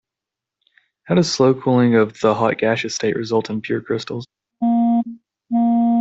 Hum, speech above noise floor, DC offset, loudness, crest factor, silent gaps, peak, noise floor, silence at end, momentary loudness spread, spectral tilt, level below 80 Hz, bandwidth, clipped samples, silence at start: none; 68 dB; under 0.1%; -18 LUFS; 16 dB; none; -2 dBFS; -86 dBFS; 0 s; 9 LU; -6 dB/octave; -60 dBFS; 8 kHz; under 0.1%; 1.05 s